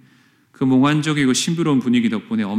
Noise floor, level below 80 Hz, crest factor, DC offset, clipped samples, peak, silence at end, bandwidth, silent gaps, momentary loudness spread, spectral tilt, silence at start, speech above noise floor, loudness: -54 dBFS; -62 dBFS; 14 dB; under 0.1%; under 0.1%; -6 dBFS; 0 s; 14 kHz; none; 6 LU; -5 dB/octave; 0.6 s; 37 dB; -18 LUFS